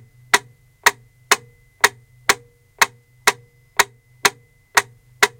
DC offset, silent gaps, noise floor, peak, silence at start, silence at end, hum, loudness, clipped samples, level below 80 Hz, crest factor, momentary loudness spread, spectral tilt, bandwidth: under 0.1%; none; -37 dBFS; 0 dBFS; 0.35 s; 0.1 s; none; -19 LUFS; under 0.1%; -56 dBFS; 22 dB; 4 LU; 0 dB/octave; 17 kHz